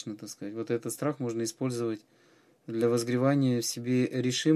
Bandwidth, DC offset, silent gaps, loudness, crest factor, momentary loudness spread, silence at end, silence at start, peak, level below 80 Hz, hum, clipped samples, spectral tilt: 14.5 kHz; under 0.1%; none; -30 LUFS; 18 dB; 13 LU; 0 s; 0 s; -12 dBFS; -76 dBFS; none; under 0.1%; -5.5 dB/octave